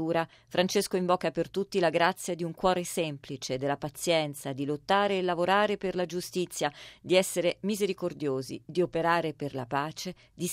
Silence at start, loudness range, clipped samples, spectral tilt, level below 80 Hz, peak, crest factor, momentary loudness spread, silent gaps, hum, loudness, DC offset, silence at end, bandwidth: 0 s; 2 LU; under 0.1%; -4.5 dB/octave; -62 dBFS; -10 dBFS; 20 dB; 9 LU; none; none; -29 LUFS; under 0.1%; 0 s; 16 kHz